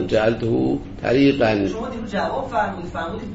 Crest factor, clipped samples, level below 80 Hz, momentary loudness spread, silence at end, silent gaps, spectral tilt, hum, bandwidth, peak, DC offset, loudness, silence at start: 16 dB; under 0.1%; -40 dBFS; 11 LU; 0 s; none; -7 dB/octave; none; 8 kHz; -4 dBFS; under 0.1%; -21 LUFS; 0 s